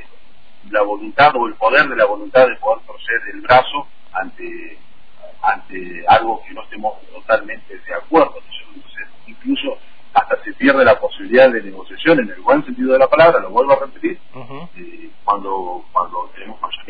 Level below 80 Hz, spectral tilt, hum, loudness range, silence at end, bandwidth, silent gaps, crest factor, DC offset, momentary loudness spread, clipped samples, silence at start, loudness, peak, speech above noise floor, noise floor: -50 dBFS; -7.5 dB/octave; none; 7 LU; 0.1 s; 5 kHz; none; 18 dB; 4%; 21 LU; under 0.1%; 0.7 s; -16 LUFS; 0 dBFS; 35 dB; -51 dBFS